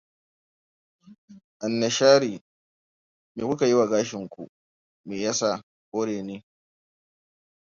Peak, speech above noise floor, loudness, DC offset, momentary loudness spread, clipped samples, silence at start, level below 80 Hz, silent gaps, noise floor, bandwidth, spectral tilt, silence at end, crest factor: -4 dBFS; over 67 dB; -24 LUFS; under 0.1%; 22 LU; under 0.1%; 1.1 s; -70 dBFS; 1.18-1.28 s, 1.44-1.60 s, 2.41-3.35 s, 4.49-5.04 s, 5.63-5.92 s; under -90 dBFS; 7.6 kHz; -4 dB/octave; 1.35 s; 22 dB